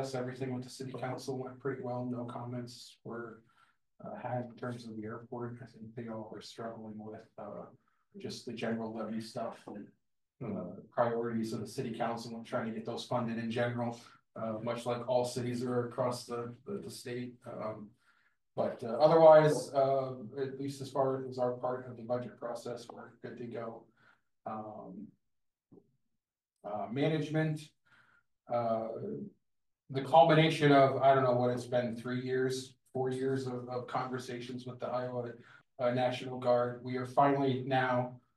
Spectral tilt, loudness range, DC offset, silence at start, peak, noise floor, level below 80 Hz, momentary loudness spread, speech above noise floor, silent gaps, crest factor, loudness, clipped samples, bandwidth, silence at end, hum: -6.5 dB/octave; 15 LU; under 0.1%; 0 s; -10 dBFS; -87 dBFS; -78 dBFS; 19 LU; 54 dB; none; 24 dB; -33 LUFS; under 0.1%; 12.5 kHz; 0.2 s; none